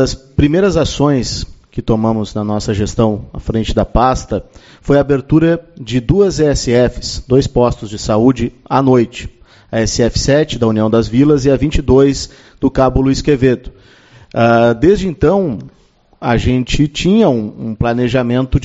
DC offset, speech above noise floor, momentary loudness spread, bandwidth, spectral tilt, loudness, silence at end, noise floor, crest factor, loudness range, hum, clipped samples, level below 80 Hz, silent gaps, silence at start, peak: under 0.1%; 30 dB; 11 LU; 8.2 kHz; -6 dB/octave; -14 LUFS; 0 s; -43 dBFS; 14 dB; 3 LU; none; under 0.1%; -28 dBFS; none; 0 s; 0 dBFS